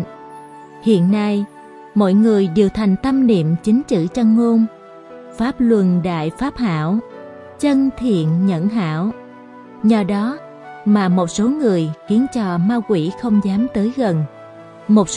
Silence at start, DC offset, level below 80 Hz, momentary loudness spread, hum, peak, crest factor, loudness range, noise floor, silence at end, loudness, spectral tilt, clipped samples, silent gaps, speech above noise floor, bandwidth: 0 s; under 0.1%; -48 dBFS; 14 LU; none; -2 dBFS; 16 dB; 3 LU; -38 dBFS; 0 s; -17 LUFS; -7 dB/octave; under 0.1%; none; 23 dB; 11 kHz